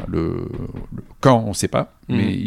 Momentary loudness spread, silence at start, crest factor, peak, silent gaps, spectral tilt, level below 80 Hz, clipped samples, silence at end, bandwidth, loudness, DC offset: 16 LU; 0 s; 20 dB; -2 dBFS; none; -6 dB/octave; -40 dBFS; under 0.1%; 0 s; 15 kHz; -20 LUFS; under 0.1%